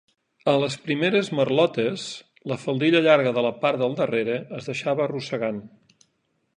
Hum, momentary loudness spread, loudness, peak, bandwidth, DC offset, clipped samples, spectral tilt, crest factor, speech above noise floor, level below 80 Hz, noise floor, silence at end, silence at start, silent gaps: none; 12 LU; -23 LUFS; -6 dBFS; 10.5 kHz; under 0.1%; under 0.1%; -5.5 dB/octave; 18 dB; 49 dB; -70 dBFS; -72 dBFS; 0.9 s; 0.45 s; none